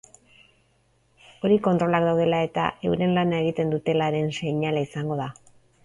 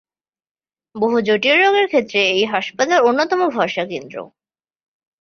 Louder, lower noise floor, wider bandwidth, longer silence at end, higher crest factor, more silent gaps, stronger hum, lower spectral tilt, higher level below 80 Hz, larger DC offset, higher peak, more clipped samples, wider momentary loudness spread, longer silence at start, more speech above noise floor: second, -24 LUFS vs -16 LUFS; second, -65 dBFS vs under -90 dBFS; first, 11 kHz vs 6.8 kHz; second, 0.5 s vs 0.95 s; about the same, 18 dB vs 16 dB; neither; neither; first, -7 dB/octave vs -3.5 dB/octave; first, -58 dBFS vs -64 dBFS; neither; second, -6 dBFS vs -2 dBFS; neither; second, 8 LU vs 12 LU; first, 1.45 s vs 0.95 s; second, 42 dB vs over 73 dB